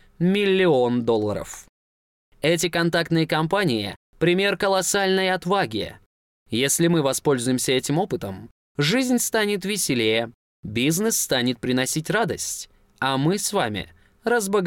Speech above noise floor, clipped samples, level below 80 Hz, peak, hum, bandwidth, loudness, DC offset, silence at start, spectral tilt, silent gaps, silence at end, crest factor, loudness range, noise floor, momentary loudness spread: over 68 dB; under 0.1%; -56 dBFS; -10 dBFS; none; 17 kHz; -22 LUFS; under 0.1%; 0.2 s; -4 dB/octave; 1.69-2.32 s, 3.96-4.13 s, 6.06-6.46 s, 8.51-8.75 s, 10.34-10.63 s; 0 s; 12 dB; 2 LU; under -90 dBFS; 12 LU